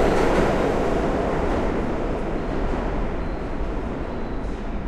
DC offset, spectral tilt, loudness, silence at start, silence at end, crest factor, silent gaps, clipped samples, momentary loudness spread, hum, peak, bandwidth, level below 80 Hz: under 0.1%; -7 dB/octave; -25 LUFS; 0 s; 0 s; 16 dB; none; under 0.1%; 10 LU; none; -6 dBFS; 12 kHz; -28 dBFS